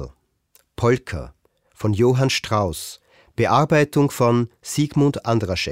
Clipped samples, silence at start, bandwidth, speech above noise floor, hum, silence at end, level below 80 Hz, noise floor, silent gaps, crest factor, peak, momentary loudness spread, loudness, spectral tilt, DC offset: under 0.1%; 0 s; 16 kHz; 41 dB; none; 0 s; -46 dBFS; -60 dBFS; none; 18 dB; -4 dBFS; 15 LU; -20 LUFS; -6 dB/octave; 0.1%